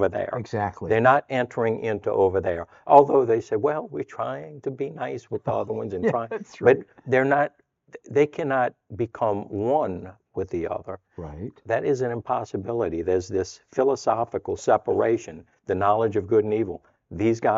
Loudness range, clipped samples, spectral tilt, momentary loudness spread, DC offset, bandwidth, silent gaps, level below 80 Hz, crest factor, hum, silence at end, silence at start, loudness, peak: 6 LU; under 0.1%; -7 dB/octave; 13 LU; under 0.1%; 7.8 kHz; none; -60 dBFS; 24 dB; none; 0 s; 0 s; -24 LUFS; 0 dBFS